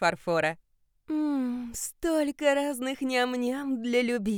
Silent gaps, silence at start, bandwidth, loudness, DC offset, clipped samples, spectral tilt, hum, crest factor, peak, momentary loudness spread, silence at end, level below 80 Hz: none; 0 s; 19.5 kHz; -28 LUFS; under 0.1%; under 0.1%; -4 dB/octave; none; 18 dB; -10 dBFS; 7 LU; 0 s; -58 dBFS